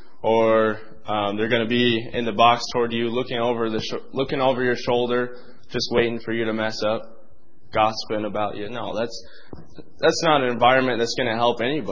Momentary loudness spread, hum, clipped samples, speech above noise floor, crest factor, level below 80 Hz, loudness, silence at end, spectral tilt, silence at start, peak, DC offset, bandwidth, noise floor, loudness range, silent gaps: 11 LU; none; under 0.1%; 34 dB; 20 dB; -54 dBFS; -22 LUFS; 0 s; -4.5 dB/octave; 0.25 s; -2 dBFS; 2%; 7.6 kHz; -56 dBFS; 5 LU; none